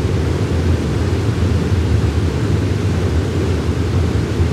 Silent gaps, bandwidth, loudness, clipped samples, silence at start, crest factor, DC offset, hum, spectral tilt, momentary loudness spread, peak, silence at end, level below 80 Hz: none; 12 kHz; -17 LUFS; under 0.1%; 0 s; 10 dB; under 0.1%; none; -7 dB/octave; 2 LU; -4 dBFS; 0 s; -26 dBFS